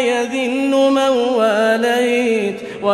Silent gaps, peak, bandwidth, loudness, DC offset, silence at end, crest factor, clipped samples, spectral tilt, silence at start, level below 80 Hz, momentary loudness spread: none; -4 dBFS; 13.5 kHz; -16 LUFS; under 0.1%; 0 s; 12 dB; under 0.1%; -4 dB/octave; 0 s; -60 dBFS; 5 LU